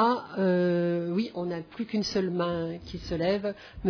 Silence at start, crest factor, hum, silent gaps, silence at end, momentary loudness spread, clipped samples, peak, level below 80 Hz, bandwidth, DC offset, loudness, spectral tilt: 0 s; 16 dB; none; none; 0 s; 10 LU; under 0.1%; -12 dBFS; -52 dBFS; 5.4 kHz; under 0.1%; -29 LUFS; -6.5 dB/octave